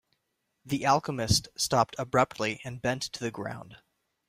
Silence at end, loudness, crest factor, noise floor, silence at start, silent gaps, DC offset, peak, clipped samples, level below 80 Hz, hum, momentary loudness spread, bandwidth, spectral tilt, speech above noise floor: 0.5 s; -29 LUFS; 22 dB; -79 dBFS; 0.65 s; none; under 0.1%; -10 dBFS; under 0.1%; -54 dBFS; none; 9 LU; 16 kHz; -4 dB/octave; 50 dB